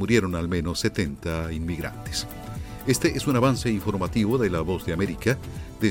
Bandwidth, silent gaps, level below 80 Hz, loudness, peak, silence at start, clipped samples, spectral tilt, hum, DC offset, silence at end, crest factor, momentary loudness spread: 17 kHz; none; -40 dBFS; -26 LUFS; -6 dBFS; 0 s; under 0.1%; -5.5 dB/octave; none; under 0.1%; 0 s; 18 dB; 9 LU